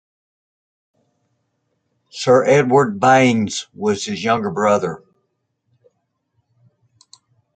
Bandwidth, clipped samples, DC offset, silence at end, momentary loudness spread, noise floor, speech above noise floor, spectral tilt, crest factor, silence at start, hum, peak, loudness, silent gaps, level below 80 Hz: 9.2 kHz; under 0.1%; under 0.1%; 2.6 s; 11 LU; -71 dBFS; 55 dB; -5 dB/octave; 20 dB; 2.15 s; none; 0 dBFS; -16 LUFS; none; -64 dBFS